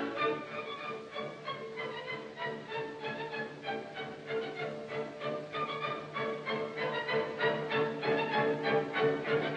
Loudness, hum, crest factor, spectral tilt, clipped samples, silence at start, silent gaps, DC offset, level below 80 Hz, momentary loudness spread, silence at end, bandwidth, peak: -35 LUFS; none; 18 dB; -6 dB/octave; under 0.1%; 0 s; none; under 0.1%; -78 dBFS; 10 LU; 0 s; 8.8 kHz; -18 dBFS